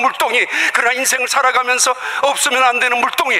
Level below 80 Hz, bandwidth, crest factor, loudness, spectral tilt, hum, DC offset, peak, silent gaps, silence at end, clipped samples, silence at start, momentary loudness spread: -64 dBFS; 16 kHz; 12 dB; -14 LUFS; 1.5 dB/octave; none; under 0.1%; -2 dBFS; none; 0 s; under 0.1%; 0 s; 3 LU